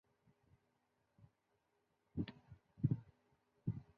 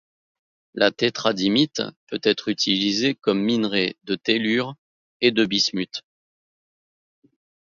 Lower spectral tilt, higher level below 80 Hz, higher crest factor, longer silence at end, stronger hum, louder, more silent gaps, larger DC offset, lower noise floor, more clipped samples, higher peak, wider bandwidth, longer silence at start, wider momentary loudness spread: first, -9.5 dB/octave vs -4 dB/octave; about the same, -68 dBFS vs -66 dBFS; about the same, 26 dB vs 22 dB; second, 0.15 s vs 1.75 s; neither; second, -45 LUFS vs -22 LUFS; second, none vs 1.96-2.07 s, 4.78-5.20 s; neither; second, -83 dBFS vs under -90 dBFS; neither; second, -22 dBFS vs -2 dBFS; second, 5 kHz vs 7.6 kHz; first, 1.2 s vs 0.75 s; first, 18 LU vs 10 LU